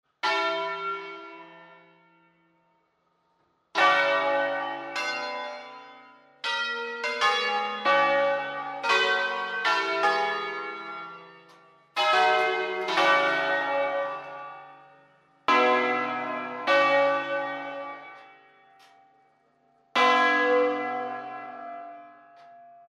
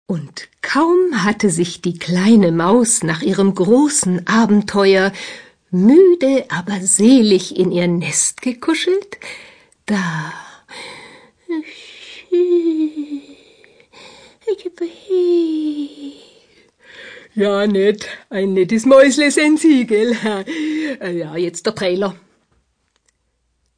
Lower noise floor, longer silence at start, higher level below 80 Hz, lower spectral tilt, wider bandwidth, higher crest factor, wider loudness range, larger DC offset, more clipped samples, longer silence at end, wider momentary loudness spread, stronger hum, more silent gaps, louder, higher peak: first, -71 dBFS vs -67 dBFS; first, 0.25 s vs 0.1 s; second, -82 dBFS vs -58 dBFS; second, -2.5 dB/octave vs -4.5 dB/octave; first, 12.5 kHz vs 10.5 kHz; about the same, 18 dB vs 16 dB; second, 4 LU vs 9 LU; neither; neither; second, 0.2 s vs 1.65 s; about the same, 19 LU vs 20 LU; neither; neither; second, -25 LUFS vs -15 LUFS; second, -10 dBFS vs 0 dBFS